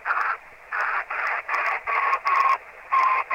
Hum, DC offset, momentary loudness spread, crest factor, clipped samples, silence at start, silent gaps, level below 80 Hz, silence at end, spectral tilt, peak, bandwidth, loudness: none; under 0.1%; 7 LU; 16 dB; under 0.1%; 0 s; none; -64 dBFS; 0 s; -1 dB/octave; -8 dBFS; 17 kHz; -24 LUFS